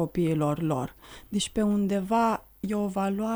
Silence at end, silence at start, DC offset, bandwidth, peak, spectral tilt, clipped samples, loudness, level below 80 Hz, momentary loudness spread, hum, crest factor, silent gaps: 0 s; 0 s; under 0.1%; over 20 kHz; -14 dBFS; -6 dB/octave; under 0.1%; -27 LUFS; -52 dBFS; 8 LU; none; 14 dB; none